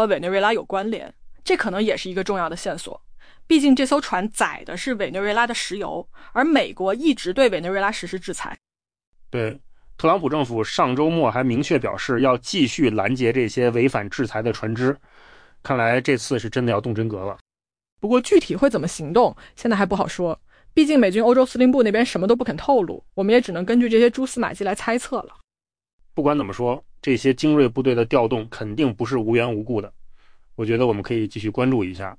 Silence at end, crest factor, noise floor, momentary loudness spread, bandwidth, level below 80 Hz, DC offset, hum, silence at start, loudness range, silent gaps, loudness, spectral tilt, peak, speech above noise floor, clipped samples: 0.05 s; 16 dB; under -90 dBFS; 12 LU; 10.5 kHz; -50 dBFS; under 0.1%; none; 0 s; 5 LU; 9.07-9.13 s, 17.41-17.46 s, 17.92-17.96 s, 25.93-25.99 s; -21 LUFS; -5.5 dB/octave; -6 dBFS; over 70 dB; under 0.1%